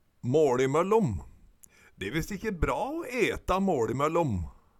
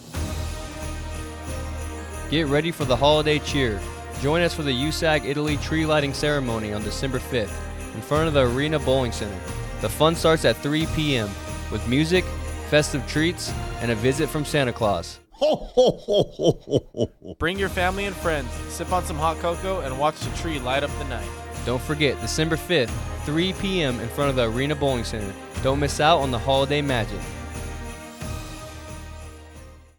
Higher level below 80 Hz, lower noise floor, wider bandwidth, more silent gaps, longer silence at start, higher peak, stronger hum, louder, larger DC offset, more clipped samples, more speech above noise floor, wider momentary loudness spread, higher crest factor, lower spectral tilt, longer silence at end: second, -44 dBFS vs -38 dBFS; first, -58 dBFS vs -44 dBFS; second, 16.5 kHz vs 19 kHz; neither; first, 0.25 s vs 0 s; second, -12 dBFS vs -4 dBFS; neither; second, -28 LUFS vs -24 LUFS; neither; neither; first, 30 dB vs 21 dB; second, 9 LU vs 13 LU; about the same, 16 dB vs 20 dB; first, -6.5 dB/octave vs -5 dB/octave; about the same, 0.3 s vs 0.2 s